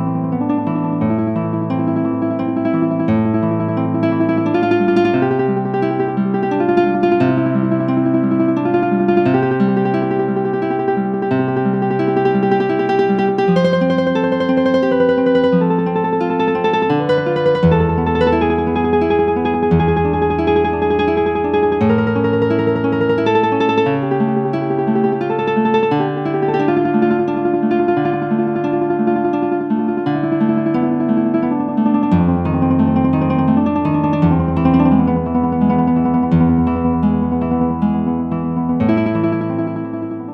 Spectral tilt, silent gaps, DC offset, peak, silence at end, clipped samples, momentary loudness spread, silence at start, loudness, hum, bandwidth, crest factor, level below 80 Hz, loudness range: -9.5 dB/octave; none; under 0.1%; 0 dBFS; 0 s; under 0.1%; 4 LU; 0 s; -16 LUFS; none; 6.2 kHz; 14 dB; -38 dBFS; 2 LU